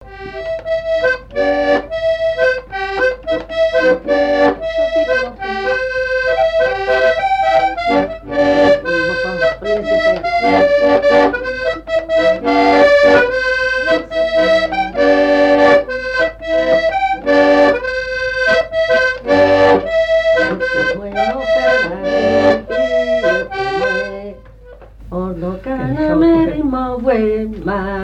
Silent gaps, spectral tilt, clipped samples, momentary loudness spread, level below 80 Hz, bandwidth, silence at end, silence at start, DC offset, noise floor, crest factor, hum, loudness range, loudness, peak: none; -5.5 dB/octave; under 0.1%; 9 LU; -38 dBFS; 9 kHz; 0 s; 0 s; under 0.1%; -38 dBFS; 14 dB; none; 5 LU; -14 LUFS; 0 dBFS